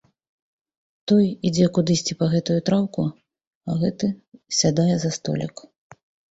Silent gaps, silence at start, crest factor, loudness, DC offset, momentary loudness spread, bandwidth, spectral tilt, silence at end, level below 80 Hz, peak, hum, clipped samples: 3.47-3.61 s, 4.28-4.32 s; 1.05 s; 18 dB; -22 LUFS; under 0.1%; 10 LU; 8 kHz; -5.5 dB/octave; 0.8 s; -56 dBFS; -6 dBFS; none; under 0.1%